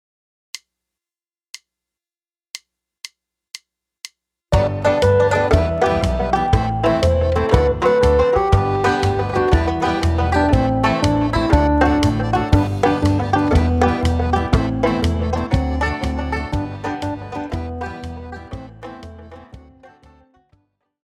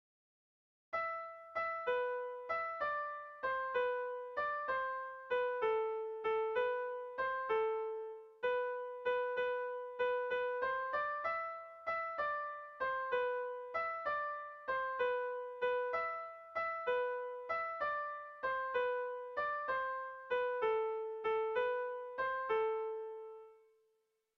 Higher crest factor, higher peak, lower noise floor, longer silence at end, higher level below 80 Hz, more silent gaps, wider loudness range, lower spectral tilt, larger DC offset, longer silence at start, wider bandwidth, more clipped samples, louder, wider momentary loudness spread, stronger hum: about the same, 18 dB vs 14 dB; first, 0 dBFS vs -26 dBFS; first, under -90 dBFS vs -81 dBFS; first, 1.45 s vs 0.8 s; first, -26 dBFS vs -76 dBFS; neither; first, 12 LU vs 2 LU; first, -7 dB/octave vs 0.5 dB/octave; neither; second, 0.55 s vs 0.9 s; first, 12 kHz vs 6 kHz; neither; first, -18 LUFS vs -38 LUFS; first, 21 LU vs 7 LU; neither